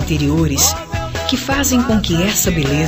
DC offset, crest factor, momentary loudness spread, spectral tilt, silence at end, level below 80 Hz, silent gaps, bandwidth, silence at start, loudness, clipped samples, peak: under 0.1%; 16 dB; 6 LU; -4 dB/octave; 0 s; -28 dBFS; none; 15.5 kHz; 0 s; -15 LUFS; under 0.1%; 0 dBFS